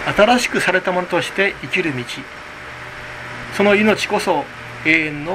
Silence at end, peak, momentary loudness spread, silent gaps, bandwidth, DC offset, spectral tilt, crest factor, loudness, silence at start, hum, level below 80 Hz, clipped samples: 0 s; 0 dBFS; 17 LU; none; 15 kHz; under 0.1%; -4 dB/octave; 18 dB; -17 LUFS; 0 s; none; -46 dBFS; under 0.1%